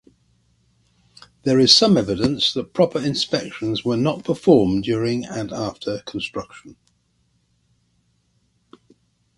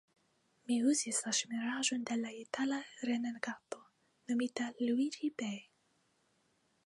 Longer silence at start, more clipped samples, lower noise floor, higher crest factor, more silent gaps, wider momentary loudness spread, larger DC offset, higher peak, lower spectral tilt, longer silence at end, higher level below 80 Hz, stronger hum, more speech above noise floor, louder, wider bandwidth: first, 1.45 s vs 0.7 s; neither; second, -65 dBFS vs -76 dBFS; about the same, 22 dB vs 20 dB; neither; about the same, 15 LU vs 14 LU; neither; first, 0 dBFS vs -18 dBFS; first, -5 dB/octave vs -2.5 dB/octave; first, 2.65 s vs 1.25 s; first, -52 dBFS vs -88 dBFS; neither; first, 46 dB vs 40 dB; first, -19 LUFS vs -36 LUFS; about the same, 11.5 kHz vs 11.5 kHz